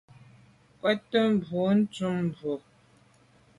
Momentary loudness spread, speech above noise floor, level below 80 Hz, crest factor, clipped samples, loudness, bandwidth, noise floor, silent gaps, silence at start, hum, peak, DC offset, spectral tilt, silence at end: 10 LU; 34 dB; -66 dBFS; 18 dB; under 0.1%; -28 LUFS; 11 kHz; -60 dBFS; none; 0.85 s; none; -12 dBFS; under 0.1%; -7 dB/octave; 1 s